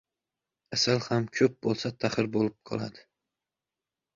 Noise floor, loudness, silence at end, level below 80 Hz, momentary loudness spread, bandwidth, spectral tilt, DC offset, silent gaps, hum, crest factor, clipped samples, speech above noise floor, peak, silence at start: -90 dBFS; -29 LUFS; 1.15 s; -64 dBFS; 10 LU; 7.6 kHz; -5 dB/octave; under 0.1%; none; none; 20 dB; under 0.1%; 62 dB; -10 dBFS; 0.7 s